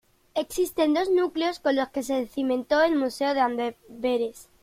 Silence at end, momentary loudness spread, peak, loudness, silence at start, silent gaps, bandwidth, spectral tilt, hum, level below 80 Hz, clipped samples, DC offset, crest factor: 0.2 s; 9 LU; -10 dBFS; -26 LUFS; 0.35 s; none; 16.5 kHz; -3.5 dB/octave; none; -60 dBFS; under 0.1%; under 0.1%; 16 dB